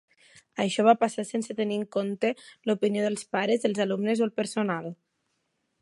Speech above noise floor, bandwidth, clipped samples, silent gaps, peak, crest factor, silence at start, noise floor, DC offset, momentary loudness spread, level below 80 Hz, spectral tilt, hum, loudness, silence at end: 50 dB; 11.5 kHz; under 0.1%; none; -6 dBFS; 22 dB; 0.55 s; -76 dBFS; under 0.1%; 9 LU; -78 dBFS; -5 dB/octave; none; -27 LUFS; 0.9 s